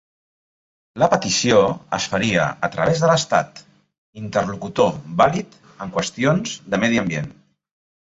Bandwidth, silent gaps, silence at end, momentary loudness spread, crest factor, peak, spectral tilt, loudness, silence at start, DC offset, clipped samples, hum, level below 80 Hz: 8 kHz; 3.98-4.13 s; 0.75 s; 12 LU; 20 dB; -2 dBFS; -4.5 dB/octave; -19 LUFS; 0.95 s; under 0.1%; under 0.1%; none; -52 dBFS